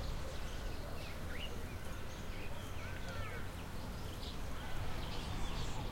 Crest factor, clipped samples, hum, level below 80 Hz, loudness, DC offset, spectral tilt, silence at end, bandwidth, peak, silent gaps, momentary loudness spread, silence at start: 14 dB; under 0.1%; none; -46 dBFS; -45 LUFS; under 0.1%; -4.5 dB/octave; 0 s; 16.5 kHz; -28 dBFS; none; 4 LU; 0 s